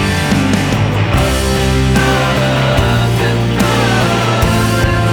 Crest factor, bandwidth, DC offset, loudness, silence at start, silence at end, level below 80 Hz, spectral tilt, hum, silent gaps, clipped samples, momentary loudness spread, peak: 12 dB; over 20 kHz; under 0.1%; -12 LUFS; 0 s; 0 s; -22 dBFS; -5.5 dB/octave; none; none; under 0.1%; 2 LU; 0 dBFS